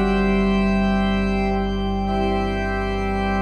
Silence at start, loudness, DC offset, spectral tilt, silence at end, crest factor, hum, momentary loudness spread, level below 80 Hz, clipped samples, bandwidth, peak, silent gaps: 0 s; -21 LUFS; under 0.1%; -7.5 dB/octave; 0 s; 12 dB; 50 Hz at -45 dBFS; 5 LU; -28 dBFS; under 0.1%; 8.4 kHz; -8 dBFS; none